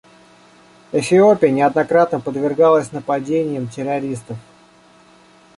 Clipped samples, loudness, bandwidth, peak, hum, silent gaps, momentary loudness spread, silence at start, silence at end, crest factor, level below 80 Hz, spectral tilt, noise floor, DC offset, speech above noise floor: under 0.1%; -17 LUFS; 11.5 kHz; -2 dBFS; none; none; 12 LU; 0.95 s; 1.15 s; 16 dB; -60 dBFS; -6.5 dB/octave; -49 dBFS; under 0.1%; 33 dB